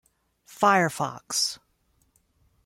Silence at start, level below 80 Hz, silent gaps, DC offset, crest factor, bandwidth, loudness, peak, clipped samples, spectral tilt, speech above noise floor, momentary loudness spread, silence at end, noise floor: 0.5 s; -70 dBFS; none; under 0.1%; 20 dB; 16.5 kHz; -24 LUFS; -8 dBFS; under 0.1%; -3 dB/octave; 44 dB; 10 LU; 1.1 s; -68 dBFS